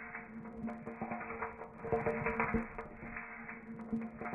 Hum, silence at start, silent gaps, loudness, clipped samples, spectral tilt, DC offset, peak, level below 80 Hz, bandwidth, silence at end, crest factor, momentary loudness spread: none; 0 s; none; -41 LUFS; under 0.1%; -9.5 dB/octave; under 0.1%; -20 dBFS; -56 dBFS; 3.6 kHz; 0 s; 20 dB; 12 LU